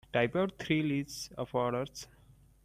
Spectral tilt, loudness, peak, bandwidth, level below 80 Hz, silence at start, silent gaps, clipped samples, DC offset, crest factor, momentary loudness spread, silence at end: -5.5 dB/octave; -33 LUFS; -14 dBFS; 15.5 kHz; -62 dBFS; 0.15 s; none; under 0.1%; under 0.1%; 20 dB; 11 LU; 0.6 s